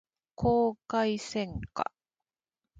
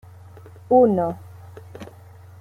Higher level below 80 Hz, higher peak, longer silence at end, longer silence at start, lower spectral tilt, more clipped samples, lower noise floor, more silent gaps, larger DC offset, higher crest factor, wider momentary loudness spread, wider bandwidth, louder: first, -52 dBFS vs -62 dBFS; second, -12 dBFS vs -4 dBFS; first, 0.95 s vs 0.55 s; second, 0.4 s vs 0.7 s; second, -6 dB/octave vs -9.5 dB/octave; neither; first, under -90 dBFS vs -44 dBFS; neither; neither; about the same, 20 dB vs 18 dB; second, 10 LU vs 26 LU; first, 9.2 kHz vs 6.6 kHz; second, -31 LUFS vs -19 LUFS